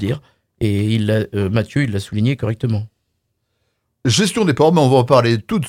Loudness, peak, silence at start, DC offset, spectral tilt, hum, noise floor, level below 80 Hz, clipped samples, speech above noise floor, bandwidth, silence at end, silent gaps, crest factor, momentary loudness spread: -17 LUFS; 0 dBFS; 0 s; under 0.1%; -6 dB/octave; none; -70 dBFS; -48 dBFS; under 0.1%; 55 dB; 15.5 kHz; 0 s; none; 18 dB; 11 LU